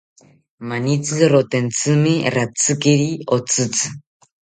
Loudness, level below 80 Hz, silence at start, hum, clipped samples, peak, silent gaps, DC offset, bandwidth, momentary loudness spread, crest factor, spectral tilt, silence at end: -18 LUFS; -58 dBFS; 0.6 s; none; under 0.1%; -2 dBFS; none; under 0.1%; 9.6 kHz; 8 LU; 18 dB; -4.5 dB/octave; 0.6 s